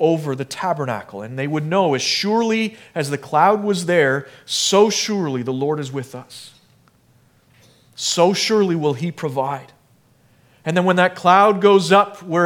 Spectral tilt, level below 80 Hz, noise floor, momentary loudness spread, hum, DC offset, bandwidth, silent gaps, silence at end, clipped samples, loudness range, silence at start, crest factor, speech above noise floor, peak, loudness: -4.5 dB/octave; -70 dBFS; -56 dBFS; 13 LU; none; under 0.1%; 17 kHz; none; 0 s; under 0.1%; 5 LU; 0 s; 18 dB; 38 dB; 0 dBFS; -18 LUFS